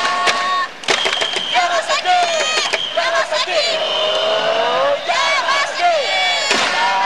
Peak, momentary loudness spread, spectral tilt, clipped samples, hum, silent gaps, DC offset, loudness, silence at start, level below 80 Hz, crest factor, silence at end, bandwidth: -2 dBFS; 2 LU; 0 dB/octave; under 0.1%; none; none; 0.8%; -16 LUFS; 0 s; -62 dBFS; 16 dB; 0 s; 13 kHz